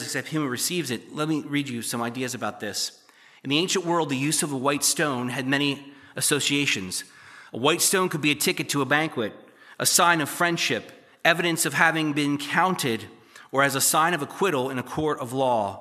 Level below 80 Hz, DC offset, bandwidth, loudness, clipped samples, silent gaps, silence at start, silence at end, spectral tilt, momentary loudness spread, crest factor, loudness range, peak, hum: -68 dBFS; under 0.1%; 15 kHz; -24 LUFS; under 0.1%; none; 0 s; 0 s; -3 dB/octave; 10 LU; 22 dB; 5 LU; -2 dBFS; none